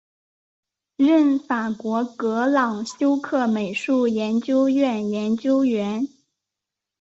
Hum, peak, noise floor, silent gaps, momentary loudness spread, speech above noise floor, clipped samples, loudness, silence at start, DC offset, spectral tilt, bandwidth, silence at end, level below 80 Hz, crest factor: none; -8 dBFS; -86 dBFS; none; 7 LU; 65 dB; under 0.1%; -21 LUFS; 1 s; under 0.1%; -6 dB/octave; 8 kHz; 0.95 s; -68 dBFS; 14 dB